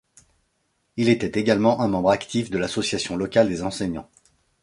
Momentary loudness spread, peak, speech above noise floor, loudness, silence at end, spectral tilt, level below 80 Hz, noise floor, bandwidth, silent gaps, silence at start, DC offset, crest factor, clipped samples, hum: 9 LU; -2 dBFS; 49 dB; -22 LUFS; 0.6 s; -5.5 dB/octave; -52 dBFS; -71 dBFS; 11.5 kHz; none; 0.95 s; under 0.1%; 20 dB; under 0.1%; none